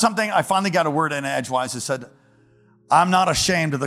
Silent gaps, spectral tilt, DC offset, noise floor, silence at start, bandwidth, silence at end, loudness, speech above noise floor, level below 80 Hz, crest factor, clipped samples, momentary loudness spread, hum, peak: none; -4 dB/octave; under 0.1%; -56 dBFS; 0 s; 16 kHz; 0 s; -20 LUFS; 35 dB; -52 dBFS; 18 dB; under 0.1%; 8 LU; none; -2 dBFS